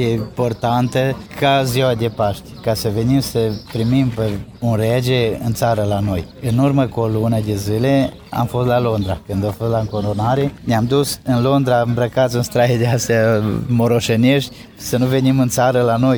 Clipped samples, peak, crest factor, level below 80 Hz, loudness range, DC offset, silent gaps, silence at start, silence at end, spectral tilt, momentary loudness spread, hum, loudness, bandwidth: under 0.1%; -2 dBFS; 14 dB; -42 dBFS; 3 LU; under 0.1%; none; 0 s; 0 s; -6 dB/octave; 6 LU; none; -17 LUFS; over 20 kHz